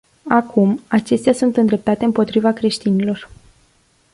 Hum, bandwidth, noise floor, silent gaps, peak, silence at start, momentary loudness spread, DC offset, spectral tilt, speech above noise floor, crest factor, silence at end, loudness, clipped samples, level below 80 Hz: none; 11.5 kHz; -57 dBFS; none; -2 dBFS; 0.25 s; 4 LU; under 0.1%; -6.5 dB/octave; 41 dB; 16 dB; 0.9 s; -17 LUFS; under 0.1%; -54 dBFS